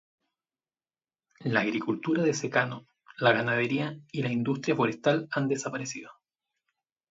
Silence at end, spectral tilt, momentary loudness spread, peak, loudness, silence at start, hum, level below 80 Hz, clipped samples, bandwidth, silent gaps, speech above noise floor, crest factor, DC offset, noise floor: 1 s; -5 dB/octave; 9 LU; -8 dBFS; -28 LUFS; 1.4 s; none; -72 dBFS; under 0.1%; 7.8 kHz; none; over 62 dB; 22 dB; under 0.1%; under -90 dBFS